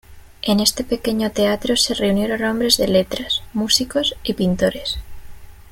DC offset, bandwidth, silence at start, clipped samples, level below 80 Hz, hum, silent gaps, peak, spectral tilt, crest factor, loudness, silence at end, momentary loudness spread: under 0.1%; 17 kHz; 0.1 s; under 0.1%; -40 dBFS; none; none; 0 dBFS; -3.5 dB/octave; 20 dB; -19 LUFS; 0 s; 6 LU